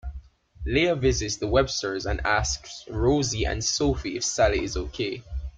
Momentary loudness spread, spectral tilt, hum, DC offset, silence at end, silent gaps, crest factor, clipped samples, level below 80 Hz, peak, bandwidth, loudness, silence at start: 9 LU; -4 dB/octave; none; under 0.1%; 0 s; none; 20 dB; under 0.1%; -36 dBFS; -6 dBFS; 9.4 kHz; -25 LUFS; 0.05 s